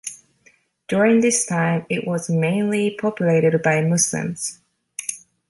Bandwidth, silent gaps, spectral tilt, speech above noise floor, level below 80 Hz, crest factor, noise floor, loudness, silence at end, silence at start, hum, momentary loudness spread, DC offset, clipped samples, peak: 12 kHz; none; -5 dB/octave; 39 dB; -64 dBFS; 16 dB; -58 dBFS; -20 LUFS; 0.3 s; 0.05 s; none; 12 LU; under 0.1%; under 0.1%; -6 dBFS